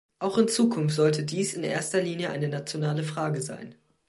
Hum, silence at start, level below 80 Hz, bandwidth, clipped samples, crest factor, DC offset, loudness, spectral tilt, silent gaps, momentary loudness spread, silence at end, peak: none; 0.2 s; -70 dBFS; 12 kHz; under 0.1%; 18 dB; under 0.1%; -27 LUFS; -5 dB/octave; none; 8 LU; 0.35 s; -8 dBFS